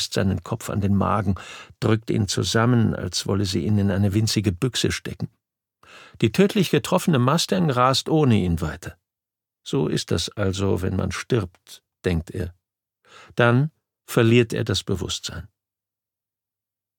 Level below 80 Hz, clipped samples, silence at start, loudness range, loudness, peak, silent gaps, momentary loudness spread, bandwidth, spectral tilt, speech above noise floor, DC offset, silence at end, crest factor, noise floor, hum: -46 dBFS; under 0.1%; 0 s; 5 LU; -22 LUFS; -2 dBFS; none; 13 LU; 19 kHz; -5.5 dB/octave; 67 dB; under 0.1%; 1.5 s; 22 dB; -89 dBFS; none